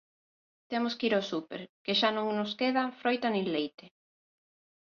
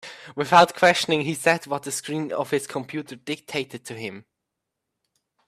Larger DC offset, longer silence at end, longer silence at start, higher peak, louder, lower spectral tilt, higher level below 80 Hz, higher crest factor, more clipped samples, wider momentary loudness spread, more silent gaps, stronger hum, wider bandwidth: neither; second, 1 s vs 1.25 s; first, 0.7 s vs 0.05 s; second, -12 dBFS vs -2 dBFS; second, -31 LUFS vs -22 LUFS; first, -5 dB/octave vs -3.5 dB/octave; second, -76 dBFS vs -68 dBFS; about the same, 20 dB vs 22 dB; neither; second, 10 LU vs 17 LU; first, 1.69-1.85 s, 3.74-3.78 s vs none; neither; second, 7 kHz vs 15.5 kHz